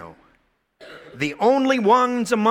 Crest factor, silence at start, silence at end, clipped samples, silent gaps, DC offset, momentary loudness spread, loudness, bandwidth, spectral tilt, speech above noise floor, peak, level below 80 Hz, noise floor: 16 dB; 0 s; 0 s; under 0.1%; none; under 0.1%; 11 LU; -19 LUFS; 15.5 kHz; -5 dB/octave; 46 dB; -4 dBFS; -62 dBFS; -64 dBFS